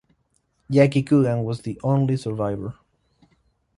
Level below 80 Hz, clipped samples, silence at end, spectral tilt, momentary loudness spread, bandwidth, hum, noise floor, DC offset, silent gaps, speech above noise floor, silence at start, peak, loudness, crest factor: -54 dBFS; under 0.1%; 1.05 s; -8.5 dB/octave; 10 LU; 11 kHz; none; -68 dBFS; under 0.1%; none; 48 dB; 0.7 s; -2 dBFS; -22 LUFS; 20 dB